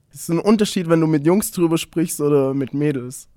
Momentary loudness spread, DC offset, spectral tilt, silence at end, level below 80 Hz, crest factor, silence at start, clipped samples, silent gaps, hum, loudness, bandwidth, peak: 6 LU; under 0.1%; -6 dB/octave; 0.15 s; -54 dBFS; 16 dB; 0.15 s; under 0.1%; none; none; -19 LUFS; 18 kHz; -2 dBFS